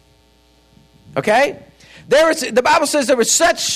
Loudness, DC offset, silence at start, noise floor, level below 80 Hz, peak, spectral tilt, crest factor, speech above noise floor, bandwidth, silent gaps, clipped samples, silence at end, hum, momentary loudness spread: -15 LUFS; under 0.1%; 1.15 s; -53 dBFS; -52 dBFS; -4 dBFS; -2 dB/octave; 14 dB; 38 dB; 15.5 kHz; none; under 0.1%; 0 s; none; 6 LU